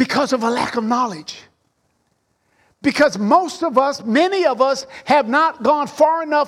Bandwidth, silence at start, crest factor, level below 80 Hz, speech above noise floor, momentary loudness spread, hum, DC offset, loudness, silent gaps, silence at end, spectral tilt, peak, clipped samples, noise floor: 14 kHz; 0 s; 16 dB; -60 dBFS; 49 dB; 7 LU; none; under 0.1%; -17 LUFS; none; 0 s; -4.5 dB/octave; -2 dBFS; under 0.1%; -66 dBFS